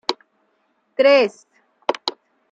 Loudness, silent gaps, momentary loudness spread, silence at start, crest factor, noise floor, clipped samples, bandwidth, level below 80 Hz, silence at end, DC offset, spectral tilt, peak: -19 LUFS; none; 16 LU; 0.1 s; 20 dB; -66 dBFS; under 0.1%; 7.8 kHz; -80 dBFS; 0.4 s; under 0.1%; -3 dB/octave; 0 dBFS